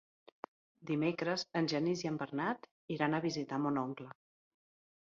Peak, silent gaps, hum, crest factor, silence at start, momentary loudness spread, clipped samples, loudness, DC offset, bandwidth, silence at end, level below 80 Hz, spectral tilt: -18 dBFS; 2.71-2.88 s; none; 20 dB; 0.8 s; 19 LU; under 0.1%; -36 LUFS; under 0.1%; 7.4 kHz; 0.9 s; -78 dBFS; -4.5 dB/octave